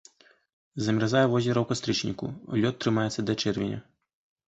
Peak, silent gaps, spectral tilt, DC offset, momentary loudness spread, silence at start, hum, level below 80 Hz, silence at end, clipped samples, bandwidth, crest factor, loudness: -10 dBFS; none; -5.5 dB/octave; under 0.1%; 10 LU; 0.75 s; none; -58 dBFS; 0.7 s; under 0.1%; 8.2 kHz; 18 dB; -27 LUFS